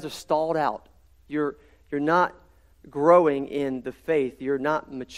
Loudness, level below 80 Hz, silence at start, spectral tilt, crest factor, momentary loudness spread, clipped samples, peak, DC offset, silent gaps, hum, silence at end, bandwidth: -25 LUFS; -58 dBFS; 0 s; -6 dB/octave; 20 dB; 14 LU; under 0.1%; -4 dBFS; under 0.1%; none; none; 0 s; 13 kHz